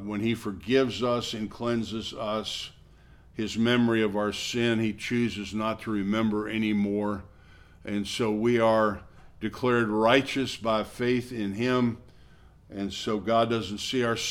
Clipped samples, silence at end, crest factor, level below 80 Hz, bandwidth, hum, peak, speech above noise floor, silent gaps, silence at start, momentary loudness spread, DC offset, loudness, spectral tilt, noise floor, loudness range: under 0.1%; 0 s; 22 dB; -56 dBFS; 15 kHz; none; -6 dBFS; 27 dB; none; 0 s; 11 LU; under 0.1%; -27 LUFS; -5 dB/octave; -54 dBFS; 4 LU